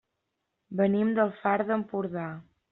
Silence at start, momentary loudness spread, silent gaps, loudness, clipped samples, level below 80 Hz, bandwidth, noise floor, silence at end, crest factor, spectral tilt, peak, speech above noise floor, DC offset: 0.7 s; 13 LU; none; -28 LUFS; under 0.1%; -70 dBFS; 4.1 kHz; -81 dBFS; 0.3 s; 16 dB; -7 dB/octave; -12 dBFS; 54 dB; under 0.1%